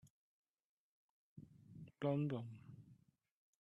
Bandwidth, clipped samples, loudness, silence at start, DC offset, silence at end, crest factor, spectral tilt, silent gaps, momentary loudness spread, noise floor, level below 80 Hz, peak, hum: 7.4 kHz; under 0.1%; -43 LUFS; 0.05 s; under 0.1%; 0.7 s; 22 dB; -9 dB/octave; 0.10-0.54 s, 0.65-1.36 s; 23 LU; -71 dBFS; -84 dBFS; -26 dBFS; none